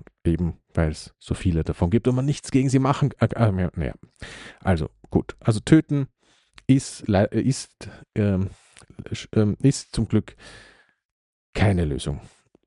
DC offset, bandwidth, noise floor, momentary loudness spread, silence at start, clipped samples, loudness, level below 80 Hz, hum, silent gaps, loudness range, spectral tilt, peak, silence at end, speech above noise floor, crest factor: under 0.1%; 11.5 kHz; -55 dBFS; 14 LU; 0.25 s; under 0.1%; -23 LUFS; -42 dBFS; none; 11.05-11.53 s; 3 LU; -7 dB/octave; -2 dBFS; 0.45 s; 33 dB; 22 dB